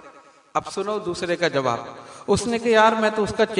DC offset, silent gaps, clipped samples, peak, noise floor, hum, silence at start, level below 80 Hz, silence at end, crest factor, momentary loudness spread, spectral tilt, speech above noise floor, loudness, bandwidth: under 0.1%; none; under 0.1%; -4 dBFS; -48 dBFS; none; 0.05 s; -54 dBFS; 0 s; 18 dB; 12 LU; -4.5 dB/octave; 27 dB; -22 LUFS; 11 kHz